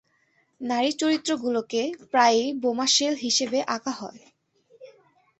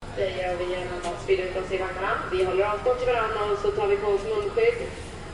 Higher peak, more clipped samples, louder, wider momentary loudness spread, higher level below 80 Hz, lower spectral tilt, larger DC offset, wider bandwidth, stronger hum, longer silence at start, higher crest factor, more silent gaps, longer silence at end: first, -4 dBFS vs -12 dBFS; neither; about the same, -24 LUFS vs -26 LUFS; first, 10 LU vs 6 LU; second, -72 dBFS vs -42 dBFS; second, -1.5 dB/octave vs -5.5 dB/octave; neither; second, 8.4 kHz vs 11.5 kHz; neither; first, 0.6 s vs 0 s; first, 22 dB vs 14 dB; neither; first, 0.5 s vs 0 s